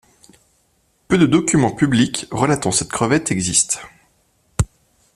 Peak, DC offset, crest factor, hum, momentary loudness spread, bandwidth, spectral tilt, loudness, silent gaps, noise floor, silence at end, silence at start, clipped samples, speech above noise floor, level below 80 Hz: 0 dBFS; under 0.1%; 20 dB; none; 9 LU; 14.5 kHz; -4 dB/octave; -17 LUFS; none; -62 dBFS; 0.5 s; 1.1 s; under 0.1%; 45 dB; -40 dBFS